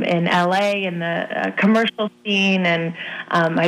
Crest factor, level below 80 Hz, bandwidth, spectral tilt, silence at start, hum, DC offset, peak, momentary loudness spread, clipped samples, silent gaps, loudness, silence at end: 14 dB; -68 dBFS; 12 kHz; -6 dB/octave; 0 s; none; under 0.1%; -6 dBFS; 7 LU; under 0.1%; none; -19 LUFS; 0 s